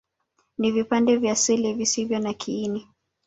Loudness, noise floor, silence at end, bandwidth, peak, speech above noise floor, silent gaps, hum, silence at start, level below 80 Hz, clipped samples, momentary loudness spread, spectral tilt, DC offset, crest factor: -23 LUFS; -71 dBFS; 0.45 s; 8.2 kHz; -8 dBFS; 48 dB; none; none; 0.6 s; -62 dBFS; under 0.1%; 9 LU; -3.5 dB/octave; under 0.1%; 16 dB